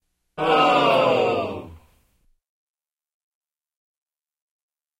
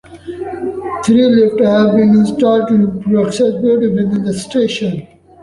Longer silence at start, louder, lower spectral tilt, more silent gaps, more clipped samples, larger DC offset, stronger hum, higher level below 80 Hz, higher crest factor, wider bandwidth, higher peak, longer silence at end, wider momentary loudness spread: first, 0.35 s vs 0.1 s; second, -19 LUFS vs -13 LUFS; second, -5 dB/octave vs -6.5 dB/octave; neither; neither; neither; neither; second, -60 dBFS vs -48 dBFS; first, 18 dB vs 12 dB; first, 16 kHz vs 11.5 kHz; second, -6 dBFS vs -2 dBFS; first, 3.25 s vs 0.4 s; first, 17 LU vs 12 LU